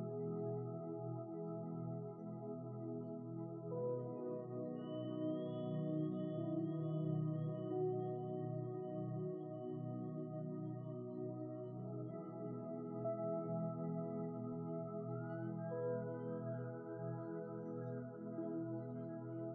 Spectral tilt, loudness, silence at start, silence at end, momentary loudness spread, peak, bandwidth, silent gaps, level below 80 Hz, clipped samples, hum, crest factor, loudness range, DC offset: -9 dB/octave; -45 LUFS; 0 s; 0 s; 6 LU; -30 dBFS; 3.5 kHz; none; -90 dBFS; under 0.1%; none; 14 dB; 5 LU; under 0.1%